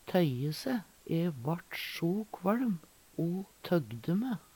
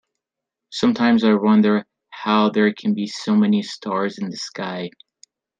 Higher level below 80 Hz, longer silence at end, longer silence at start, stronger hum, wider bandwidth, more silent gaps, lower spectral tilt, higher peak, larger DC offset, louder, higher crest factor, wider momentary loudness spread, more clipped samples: about the same, -70 dBFS vs -68 dBFS; second, 0.15 s vs 0.7 s; second, 0.05 s vs 0.7 s; neither; first, 19 kHz vs 7.8 kHz; neither; about the same, -7 dB/octave vs -6 dB/octave; second, -14 dBFS vs -2 dBFS; neither; second, -34 LUFS vs -19 LUFS; about the same, 20 dB vs 18 dB; second, 7 LU vs 12 LU; neither